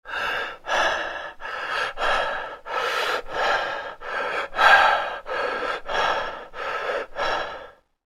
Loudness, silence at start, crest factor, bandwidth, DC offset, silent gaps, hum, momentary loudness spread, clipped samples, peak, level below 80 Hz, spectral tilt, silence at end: -24 LUFS; 0.05 s; 24 dB; 15.5 kHz; under 0.1%; none; none; 13 LU; under 0.1%; -2 dBFS; -46 dBFS; -1.5 dB/octave; 0.35 s